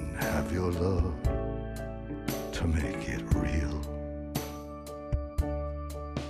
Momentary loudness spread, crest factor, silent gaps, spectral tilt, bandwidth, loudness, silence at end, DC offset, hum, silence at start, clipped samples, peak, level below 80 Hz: 9 LU; 20 dB; none; -6.5 dB/octave; 15.5 kHz; -33 LUFS; 0 s; under 0.1%; none; 0 s; under 0.1%; -12 dBFS; -36 dBFS